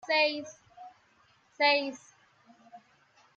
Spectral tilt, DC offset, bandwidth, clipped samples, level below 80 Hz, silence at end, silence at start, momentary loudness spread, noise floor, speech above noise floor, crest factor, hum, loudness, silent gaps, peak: -1.5 dB/octave; under 0.1%; 7.8 kHz; under 0.1%; -84 dBFS; 0.6 s; 0.05 s; 26 LU; -66 dBFS; 37 dB; 22 dB; none; -28 LUFS; none; -12 dBFS